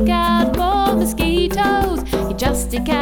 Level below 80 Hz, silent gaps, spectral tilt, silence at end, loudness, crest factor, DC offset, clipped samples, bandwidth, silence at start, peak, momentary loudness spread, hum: -26 dBFS; none; -5 dB/octave; 0 s; -18 LUFS; 12 dB; under 0.1%; under 0.1%; over 20 kHz; 0 s; -4 dBFS; 5 LU; none